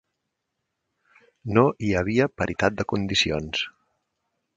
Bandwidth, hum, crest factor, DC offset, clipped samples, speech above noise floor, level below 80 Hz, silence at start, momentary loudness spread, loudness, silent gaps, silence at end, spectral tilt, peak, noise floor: 9.4 kHz; none; 24 dB; under 0.1%; under 0.1%; 57 dB; -48 dBFS; 1.45 s; 8 LU; -24 LUFS; none; 0.9 s; -5 dB/octave; -4 dBFS; -80 dBFS